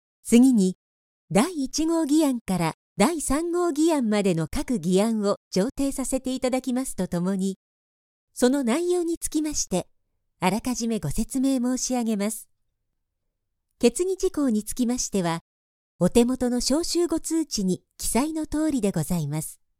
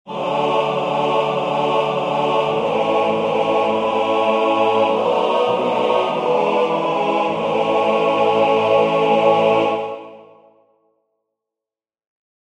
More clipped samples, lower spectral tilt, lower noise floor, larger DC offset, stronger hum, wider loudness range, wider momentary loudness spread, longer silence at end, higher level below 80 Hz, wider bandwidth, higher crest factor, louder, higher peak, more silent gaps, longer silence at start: neither; about the same, -5 dB/octave vs -5.5 dB/octave; second, -78 dBFS vs -89 dBFS; neither; neither; about the same, 3 LU vs 2 LU; first, 7 LU vs 4 LU; second, 0.25 s vs 2.2 s; first, -44 dBFS vs -62 dBFS; first, 16.5 kHz vs 10 kHz; about the same, 20 dB vs 16 dB; second, -24 LUFS vs -17 LUFS; about the same, -4 dBFS vs -2 dBFS; first, 0.75-1.28 s, 2.41-2.46 s, 2.74-2.96 s, 5.37-5.51 s, 7.56-8.28 s, 9.17-9.21 s, 15.41-15.99 s vs none; first, 0.25 s vs 0.05 s